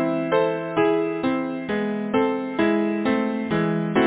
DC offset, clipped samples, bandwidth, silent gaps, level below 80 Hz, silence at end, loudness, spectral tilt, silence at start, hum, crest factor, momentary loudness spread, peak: under 0.1%; under 0.1%; 4 kHz; none; -56 dBFS; 0 s; -23 LUFS; -10.5 dB/octave; 0 s; none; 16 dB; 4 LU; -6 dBFS